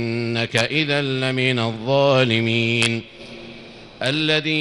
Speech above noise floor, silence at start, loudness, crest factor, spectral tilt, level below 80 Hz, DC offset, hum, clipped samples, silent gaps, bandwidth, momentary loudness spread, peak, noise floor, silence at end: 20 dB; 0 s; -19 LUFS; 18 dB; -5 dB/octave; -54 dBFS; under 0.1%; none; under 0.1%; none; 12 kHz; 20 LU; -2 dBFS; -40 dBFS; 0 s